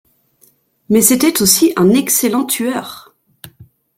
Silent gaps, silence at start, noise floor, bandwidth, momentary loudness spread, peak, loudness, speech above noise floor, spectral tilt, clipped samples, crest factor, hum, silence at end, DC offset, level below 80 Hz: none; 0.9 s; -54 dBFS; 17 kHz; 9 LU; 0 dBFS; -12 LUFS; 41 dB; -3.5 dB/octave; under 0.1%; 16 dB; none; 0.35 s; under 0.1%; -52 dBFS